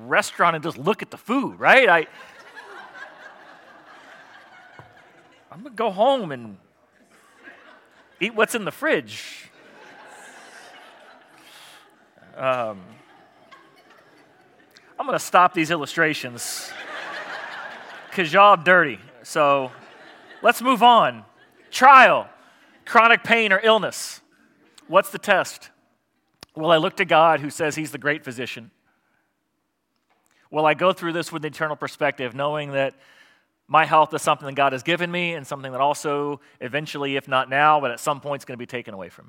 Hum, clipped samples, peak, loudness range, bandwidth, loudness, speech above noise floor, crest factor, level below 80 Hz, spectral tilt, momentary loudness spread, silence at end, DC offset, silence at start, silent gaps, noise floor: none; under 0.1%; 0 dBFS; 14 LU; 17 kHz; -20 LUFS; 54 dB; 22 dB; -78 dBFS; -3.5 dB/octave; 20 LU; 0.2 s; under 0.1%; 0 s; none; -74 dBFS